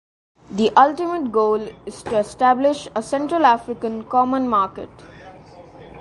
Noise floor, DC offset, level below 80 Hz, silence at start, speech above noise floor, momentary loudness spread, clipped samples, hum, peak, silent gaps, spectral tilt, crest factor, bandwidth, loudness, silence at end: -42 dBFS; under 0.1%; -54 dBFS; 0.5 s; 23 dB; 13 LU; under 0.1%; none; 0 dBFS; none; -5 dB/octave; 20 dB; 11.5 kHz; -19 LUFS; 0 s